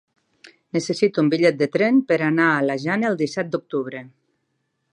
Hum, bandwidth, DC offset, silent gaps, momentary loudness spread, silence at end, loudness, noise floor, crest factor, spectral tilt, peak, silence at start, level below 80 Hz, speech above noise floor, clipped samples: none; 10.5 kHz; under 0.1%; none; 10 LU; 0.85 s; -20 LUFS; -73 dBFS; 18 dB; -6 dB/octave; -4 dBFS; 0.45 s; -72 dBFS; 53 dB; under 0.1%